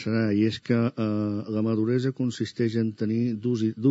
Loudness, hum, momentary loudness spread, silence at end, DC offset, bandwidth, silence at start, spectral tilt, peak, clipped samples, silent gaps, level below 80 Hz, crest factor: -26 LUFS; none; 4 LU; 0 s; under 0.1%; 8 kHz; 0 s; -7.5 dB/octave; -10 dBFS; under 0.1%; none; -68 dBFS; 16 dB